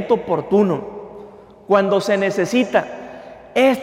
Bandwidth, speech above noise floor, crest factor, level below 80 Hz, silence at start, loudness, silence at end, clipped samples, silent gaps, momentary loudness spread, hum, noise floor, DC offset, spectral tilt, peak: 16 kHz; 24 dB; 16 dB; -56 dBFS; 0 s; -18 LUFS; 0 s; under 0.1%; none; 20 LU; none; -41 dBFS; under 0.1%; -5.5 dB/octave; -4 dBFS